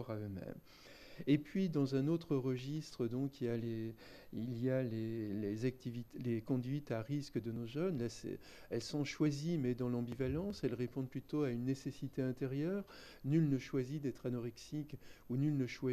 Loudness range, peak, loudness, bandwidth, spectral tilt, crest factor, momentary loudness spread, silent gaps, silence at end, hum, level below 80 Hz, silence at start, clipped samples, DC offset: 2 LU; -20 dBFS; -40 LUFS; 13.5 kHz; -7.5 dB/octave; 18 dB; 11 LU; none; 0 s; none; -66 dBFS; 0 s; under 0.1%; under 0.1%